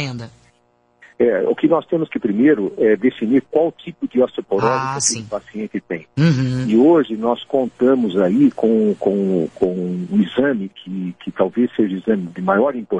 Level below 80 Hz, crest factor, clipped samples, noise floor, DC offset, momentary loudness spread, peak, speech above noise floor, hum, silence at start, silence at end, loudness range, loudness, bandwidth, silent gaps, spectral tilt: -56 dBFS; 18 dB; under 0.1%; -60 dBFS; under 0.1%; 12 LU; 0 dBFS; 42 dB; none; 0 s; 0 s; 3 LU; -18 LUFS; 11 kHz; none; -6 dB/octave